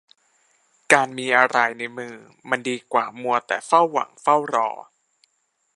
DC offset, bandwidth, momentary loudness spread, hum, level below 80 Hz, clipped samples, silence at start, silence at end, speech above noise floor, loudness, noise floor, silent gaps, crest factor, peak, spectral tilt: under 0.1%; 11.5 kHz; 14 LU; none; -76 dBFS; under 0.1%; 0.9 s; 0.95 s; 49 dB; -21 LUFS; -71 dBFS; none; 22 dB; 0 dBFS; -3 dB/octave